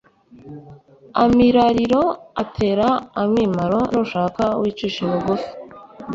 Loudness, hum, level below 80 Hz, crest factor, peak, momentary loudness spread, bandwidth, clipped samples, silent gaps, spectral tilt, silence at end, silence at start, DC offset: -19 LUFS; none; -46 dBFS; 16 dB; -2 dBFS; 22 LU; 7.6 kHz; under 0.1%; none; -7 dB/octave; 0 s; 0.45 s; under 0.1%